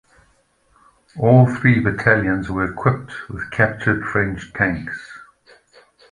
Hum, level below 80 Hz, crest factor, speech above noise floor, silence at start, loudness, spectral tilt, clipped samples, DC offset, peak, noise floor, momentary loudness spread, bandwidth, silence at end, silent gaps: none; -44 dBFS; 20 dB; 42 dB; 1.15 s; -18 LUFS; -8.5 dB/octave; under 0.1%; under 0.1%; 0 dBFS; -60 dBFS; 17 LU; 9.8 kHz; 0.9 s; none